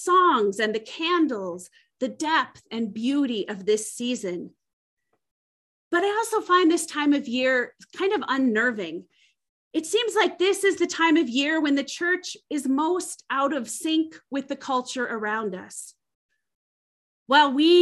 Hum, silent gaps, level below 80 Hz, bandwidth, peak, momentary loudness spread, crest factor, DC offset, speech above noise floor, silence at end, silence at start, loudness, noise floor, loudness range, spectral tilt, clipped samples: none; 4.73-4.97 s, 5.31-5.91 s, 9.49-9.71 s, 16.15-16.29 s, 16.55-17.26 s; -76 dBFS; 12.5 kHz; -6 dBFS; 13 LU; 18 dB; under 0.1%; over 66 dB; 0 s; 0 s; -24 LUFS; under -90 dBFS; 6 LU; -3 dB/octave; under 0.1%